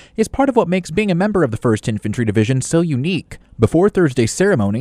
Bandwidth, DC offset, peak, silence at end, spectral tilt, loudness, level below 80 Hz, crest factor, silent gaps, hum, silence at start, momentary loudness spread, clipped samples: 14 kHz; under 0.1%; 0 dBFS; 0 s; -6.5 dB/octave; -17 LUFS; -42 dBFS; 16 dB; none; none; 0.2 s; 5 LU; under 0.1%